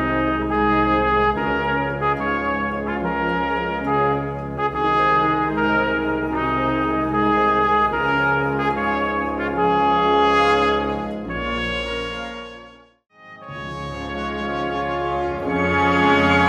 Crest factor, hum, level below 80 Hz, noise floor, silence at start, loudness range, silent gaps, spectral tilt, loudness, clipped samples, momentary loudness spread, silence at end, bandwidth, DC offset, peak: 16 dB; none; -38 dBFS; -45 dBFS; 0 s; 9 LU; none; -6.5 dB/octave; -20 LUFS; under 0.1%; 10 LU; 0 s; 12 kHz; under 0.1%; -4 dBFS